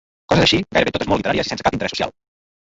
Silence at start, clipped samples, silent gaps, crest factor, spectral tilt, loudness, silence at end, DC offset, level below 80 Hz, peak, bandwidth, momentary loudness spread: 0.3 s; under 0.1%; none; 18 dB; -4.5 dB/octave; -18 LUFS; 0.6 s; under 0.1%; -40 dBFS; -2 dBFS; 8 kHz; 8 LU